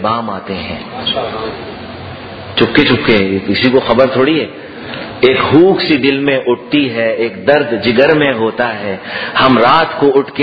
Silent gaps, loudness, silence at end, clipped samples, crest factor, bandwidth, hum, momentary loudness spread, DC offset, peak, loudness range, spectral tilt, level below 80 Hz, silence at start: none; -12 LUFS; 0 s; 0.2%; 12 dB; 6 kHz; none; 16 LU; under 0.1%; 0 dBFS; 3 LU; -8 dB/octave; -44 dBFS; 0 s